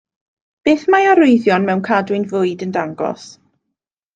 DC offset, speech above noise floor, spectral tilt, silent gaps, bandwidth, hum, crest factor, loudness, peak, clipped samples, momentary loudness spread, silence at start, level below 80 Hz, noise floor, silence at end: under 0.1%; 63 dB; -6.5 dB/octave; none; 9 kHz; none; 14 dB; -15 LUFS; -2 dBFS; under 0.1%; 12 LU; 0.65 s; -60 dBFS; -78 dBFS; 0.85 s